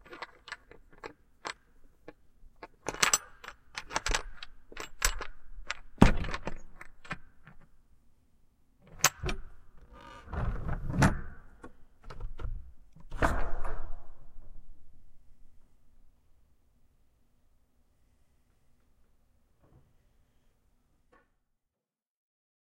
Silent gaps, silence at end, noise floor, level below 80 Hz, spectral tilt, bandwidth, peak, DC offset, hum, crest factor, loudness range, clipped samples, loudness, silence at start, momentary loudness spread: none; 6.7 s; -87 dBFS; -40 dBFS; -3.5 dB/octave; 15.5 kHz; -2 dBFS; under 0.1%; none; 32 dB; 7 LU; under 0.1%; -32 LUFS; 0.05 s; 26 LU